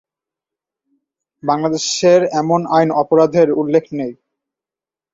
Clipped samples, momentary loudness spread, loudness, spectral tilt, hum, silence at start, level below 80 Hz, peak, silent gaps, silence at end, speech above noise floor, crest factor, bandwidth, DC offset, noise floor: under 0.1%; 13 LU; -15 LUFS; -5 dB/octave; none; 1.45 s; -62 dBFS; -2 dBFS; none; 1 s; 75 dB; 16 dB; 7.8 kHz; under 0.1%; -90 dBFS